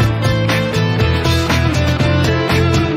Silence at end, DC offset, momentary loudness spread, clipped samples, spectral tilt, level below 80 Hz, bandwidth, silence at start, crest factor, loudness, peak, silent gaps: 0 s; under 0.1%; 2 LU; under 0.1%; -6 dB/octave; -30 dBFS; 16 kHz; 0 s; 10 dB; -15 LUFS; -4 dBFS; none